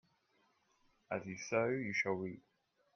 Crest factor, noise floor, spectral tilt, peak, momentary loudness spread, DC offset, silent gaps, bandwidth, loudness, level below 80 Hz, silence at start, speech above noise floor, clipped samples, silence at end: 20 dB; -76 dBFS; -5 dB/octave; -22 dBFS; 10 LU; under 0.1%; none; 6.8 kHz; -39 LUFS; -80 dBFS; 1.1 s; 38 dB; under 0.1%; 0.55 s